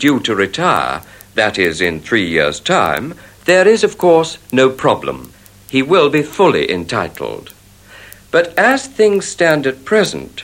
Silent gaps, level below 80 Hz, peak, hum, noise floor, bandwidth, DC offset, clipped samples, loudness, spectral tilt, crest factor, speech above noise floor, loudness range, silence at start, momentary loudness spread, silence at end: none; -48 dBFS; 0 dBFS; none; -41 dBFS; 16.5 kHz; under 0.1%; under 0.1%; -14 LUFS; -4.5 dB/octave; 14 dB; 27 dB; 3 LU; 0 s; 10 LU; 0 s